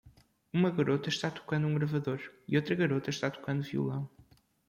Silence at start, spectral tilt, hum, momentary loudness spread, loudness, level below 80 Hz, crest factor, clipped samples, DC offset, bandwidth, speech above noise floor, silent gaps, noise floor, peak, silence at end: 0.05 s; -6.5 dB/octave; none; 7 LU; -32 LUFS; -68 dBFS; 18 dB; under 0.1%; under 0.1%; 10.5 kHz; 31 dB; none; -62 dBFS; -14 dBFS; 0.45 s